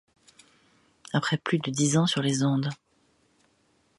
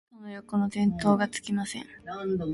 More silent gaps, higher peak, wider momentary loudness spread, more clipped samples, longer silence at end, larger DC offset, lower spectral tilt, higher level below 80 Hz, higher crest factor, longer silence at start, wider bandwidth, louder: neither; about the same, -10 dBFS vs -10 dBFS; second, 8 LU vs 15 LU; neither; first, 1.25 s vs 0 s; neither; second, -4.5 dB/octave vs -6 dB/octave; second, -70 dBFS vs -58 dBFS; about the same, 18 dB vs 18 dB; first, 1.15 s vs 0.15 s; about the same, 11.5 kHz vs 11.5 kHz; about the same, -26 LUFS vs -28 LUFS